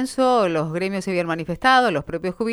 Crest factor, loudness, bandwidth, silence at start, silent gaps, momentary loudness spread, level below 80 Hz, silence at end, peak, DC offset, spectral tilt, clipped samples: 16 dB; -20 LUFS; 13.5 kHz; 0 s; none; 9 LU; -50 dBFS; 0 s; -4 dBFS; under 0.1%; -5 dB/octave; under 0.1%